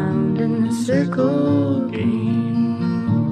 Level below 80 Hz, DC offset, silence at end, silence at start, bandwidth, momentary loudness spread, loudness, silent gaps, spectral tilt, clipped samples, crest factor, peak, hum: -58 dBFS; under 0.1%; 0 s; 0 s; 11 kHz; 3 LU; -19 LUFS; none; -8 dB/octave; under 0.1%; 12 dB; -6 dBFS; none